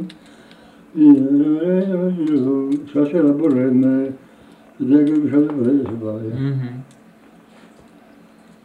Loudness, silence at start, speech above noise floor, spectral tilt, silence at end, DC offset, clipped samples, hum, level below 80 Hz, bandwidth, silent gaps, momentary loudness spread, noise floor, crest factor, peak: -17 LUFS; 0 s; 31 dB; -10 dB/octave; 1.8 s; under 0.1%; under 0.1%; none; -64 dBFS; 4.3 kHz; none; 13 LU; -47 dBFS; 16 dB; -2 dBFS